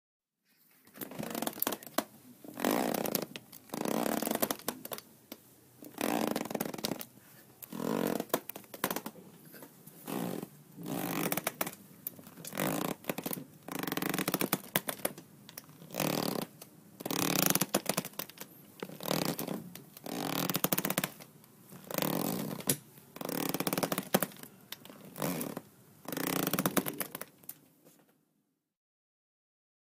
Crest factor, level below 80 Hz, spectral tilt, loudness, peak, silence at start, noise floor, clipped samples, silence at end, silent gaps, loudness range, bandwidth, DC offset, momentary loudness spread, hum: 30 dB; -72 dBFS; -3.5 dB/octave; -35 LUFS; -6 dBFS; 0.85 s; -79 dBFS; under 0.1%; 1.95 s; none; 5 LU; 16.5 kHz; under 0.1%; 18 LU; none